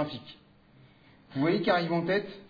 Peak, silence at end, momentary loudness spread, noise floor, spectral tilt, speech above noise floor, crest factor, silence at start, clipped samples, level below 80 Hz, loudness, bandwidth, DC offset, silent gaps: -12 dBFS; 0.05 s; 16 LU; -58 dBFS; -8 dB/octave; 29 dB; 18 dB; 0 s; under 0.1%; -68 dBFS; -28 LUFS; 5 kHz; under 0.1%; none